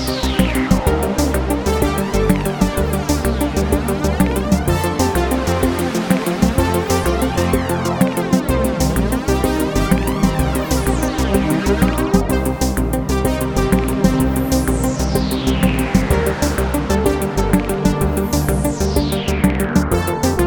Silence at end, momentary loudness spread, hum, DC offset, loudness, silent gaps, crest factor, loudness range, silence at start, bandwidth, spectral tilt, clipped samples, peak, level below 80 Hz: 0 s; 2 LU; none; under 0.1%; -17 LUFS; none; 16 dB; 1 LU; 0 s; 19.5 kHz; -5.5 dB/octave; under 0.1%; 0 dBFS; -24 dBFS